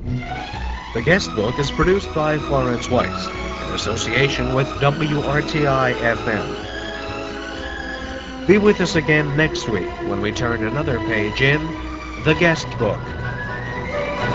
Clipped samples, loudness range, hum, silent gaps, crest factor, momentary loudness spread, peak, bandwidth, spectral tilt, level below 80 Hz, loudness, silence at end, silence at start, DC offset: under 0.1%; 2 LU; none; none; 20 dB; 11 LU; 0 dBFS; 8.2 kHz; -5.5 dB/octave; -34 dBFS; -20 LUFS; 0 s; 0 s; 0.3%